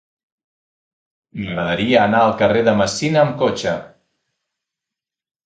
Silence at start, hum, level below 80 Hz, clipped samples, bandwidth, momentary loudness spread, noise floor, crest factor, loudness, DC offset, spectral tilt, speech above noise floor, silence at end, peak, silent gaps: 1.35 s; none; -50 dBFS; under 0.1%; 9.2 kHz; 12 LU; -86 dBFS; 20 dB; -17 LUFS; under 0.1%; -5 dB/octave; 70 dB; 1.6 s; 0 dBFS; none